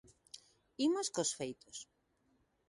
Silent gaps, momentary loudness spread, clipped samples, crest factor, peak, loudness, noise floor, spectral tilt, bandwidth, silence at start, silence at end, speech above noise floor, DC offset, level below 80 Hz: none; 21 LU; under 0.1%; 18 dB; -22 dBFS; -37 LUFS; -77 dBFS; -3 dB/octave; 11.5 kHz; 0.35 s; 0.85 s; 39 dB; under 0.1%; -80 dBFS